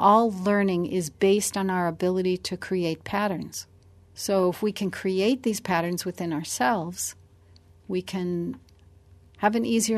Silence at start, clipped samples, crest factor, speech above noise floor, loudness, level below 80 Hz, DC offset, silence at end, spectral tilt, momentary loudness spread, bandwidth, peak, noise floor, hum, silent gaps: 0 s; under 0.1%; 20 dB; 30 dB; -26 LUFS; -60 dBFS; under 0.1%; 0 s; -4.5 dB/octave; 9 LU; 13.5 kHz; -6 dBFS; -54 dBFS; none; none